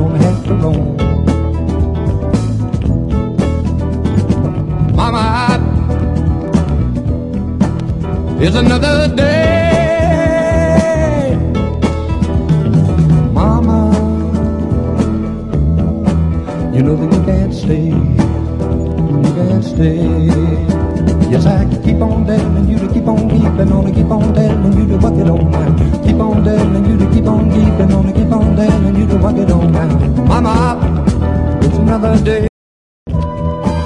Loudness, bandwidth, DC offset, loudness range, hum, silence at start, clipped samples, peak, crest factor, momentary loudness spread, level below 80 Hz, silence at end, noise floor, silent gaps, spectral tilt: -13 LUFS; 11 kHz; under 0.1%; 3 LU; none; 0 s; under 0.1%; 0 dBFS; 12 dB; 5 LU; -22 dBFS; 0 s; under -90 dBFS; 32.49-33.06 s; -8 dB/octave